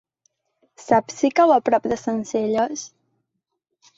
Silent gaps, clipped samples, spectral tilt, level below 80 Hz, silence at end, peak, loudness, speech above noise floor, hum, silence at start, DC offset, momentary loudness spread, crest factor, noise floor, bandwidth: none; under 0.1%; -4.5 dB/octave; -62 dBFS; 1.1 s; -4 dBFS; -20 LUFS; 59 dB; none; 0.8 s; under 0.1%; 10 LU; 18 dB; -78 dBFS; 8 kHz